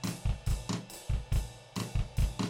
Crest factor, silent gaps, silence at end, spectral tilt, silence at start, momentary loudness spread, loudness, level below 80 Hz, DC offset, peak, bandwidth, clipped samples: 16 dB; none; 0 s; -5.5 dB/octave; 0 s; 5 LU; -36 LUFS; -36 dBFS; under 0.1%; -18 dBFS; 17 kHz; under 0.1%